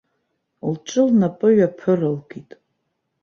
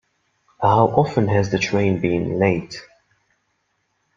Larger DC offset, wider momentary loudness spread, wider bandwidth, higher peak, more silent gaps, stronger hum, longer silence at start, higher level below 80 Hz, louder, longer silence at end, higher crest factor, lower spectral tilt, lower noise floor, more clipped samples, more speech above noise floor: neither; first, 14 LU vs 8 LU; about the same, 7.2 kHz vs 7.4 kHz; second, -6 dBFS vs -2 dBFS; neither; neither; about the same, 0.65 s vs 0.6 s; second, -64 dBFS vs -52 dBFS; about the same, -19 LUFS vs -19 LUFS; second, 0.8 s vs 1.35 s; about the same, 16 dB vs 18 dB; about the same, -7.5 dB/octave vs -7 dB/octave; first, -74 dBFS vs -70 dBFS; neither; first, 55 dB vs 51 dB